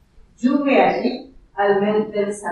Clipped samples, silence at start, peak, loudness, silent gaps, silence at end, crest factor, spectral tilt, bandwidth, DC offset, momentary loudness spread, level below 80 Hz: under 0.1%; 0.4 s; -2 dBFS; -19 LUFS; none; 0 s; 16 dB; -6 dB/octave; 11.5 kHz; under 0.1%; 10 LU; -54 dBFS